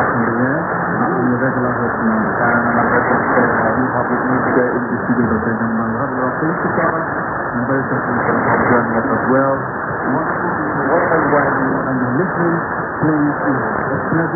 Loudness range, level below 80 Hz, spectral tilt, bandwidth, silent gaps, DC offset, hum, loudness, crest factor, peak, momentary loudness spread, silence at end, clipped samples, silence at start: 2 LU; -44 dBFS; -16.5 dB/octave; 2.4 kHz; none; under 0.1%; none; -16 LUFS; 16 dB; 0 dBFS; 4 LU; 0 s; under 0.1%; 0 s